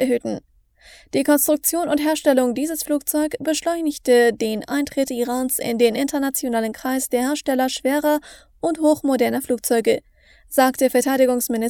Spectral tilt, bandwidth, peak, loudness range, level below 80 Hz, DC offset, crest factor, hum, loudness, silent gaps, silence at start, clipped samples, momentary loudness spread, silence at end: -3 dB/octave; over 20 kHz; -2 dBFS; 2 LU; -56 dBFS; under 0.1%; 18 dB; none; -20 LUFS; none; 0 s; under 0.1%; 7 LU; 0 s